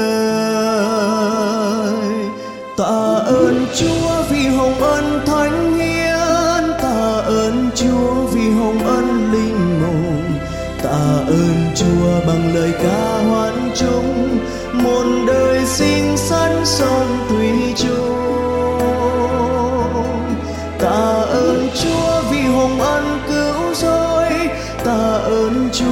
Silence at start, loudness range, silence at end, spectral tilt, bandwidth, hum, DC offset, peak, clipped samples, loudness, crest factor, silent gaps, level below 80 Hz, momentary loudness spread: 0 s; 2 LU; 0 s; -5.5 dB/octave; 17 kHz; none; under 0.1%; -2 dBFS; under 0.1%; -16 LUFS; 14 dB; none; -34 dBFS; 4 LU